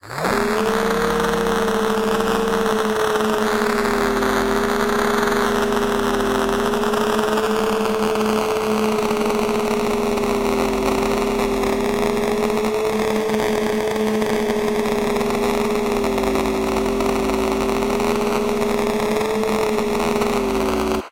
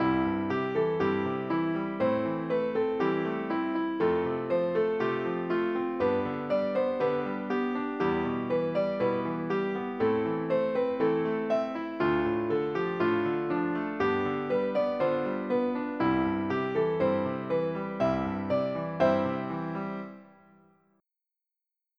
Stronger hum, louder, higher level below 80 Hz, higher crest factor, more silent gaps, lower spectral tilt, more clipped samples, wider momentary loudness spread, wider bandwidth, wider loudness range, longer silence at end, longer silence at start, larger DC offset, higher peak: neither; first, -20 LUFS vs -29 LUFS; first, -38 dBFS vs -60 dBFS; about the same, 16 dB vs 16 dB; neither; second, -4.5 dB/octave vs -8.5 dB/octave; neither; second, 1 LU vs 4 LU; first, 17 kHz vs 6.4 kHz; about the same, 1 LU vs 1 LU; second, 0 s vs 1.75 s; about the same, 0.05 s vs 0 s; neither; first, -2 dBFS vs -12 dBFS